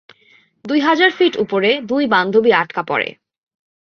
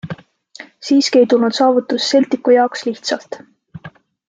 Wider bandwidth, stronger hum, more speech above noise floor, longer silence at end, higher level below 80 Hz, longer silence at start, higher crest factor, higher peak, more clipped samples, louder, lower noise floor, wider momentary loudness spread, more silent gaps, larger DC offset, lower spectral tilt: second, 6.6 kHz vs 9.2 kHz; neither; first, 38 dB vs 26 dB; first, 0.75 s vs 0.4 s; about the same, -62 dBFS vs -64 dBFS; first, 0.65 s vs 0.05 s; about the same, 16 dB vs 14 dB; about the same, -2 dBFS vs -2 dBFS; neither; about the same, -16 LUFS vs -15 LUFS; first, -53 dBFS vs -40 dBFS; second, 7 LU vs 19 LU; neither; neither; first, -5.5 dB/octave vs -4 dB/octave